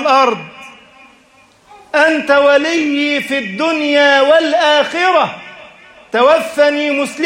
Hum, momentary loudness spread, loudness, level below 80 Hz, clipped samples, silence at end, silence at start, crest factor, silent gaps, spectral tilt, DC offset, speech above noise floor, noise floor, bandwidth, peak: none; 10 LU; -12 LUFS; -60 dBFS; under 0.1%; 0 s; 0 s; 14 dB; none; -3 dB/octave; under 0.1%; 36 dB; -48 dBFS; 15.5 kHz; 0 dBFS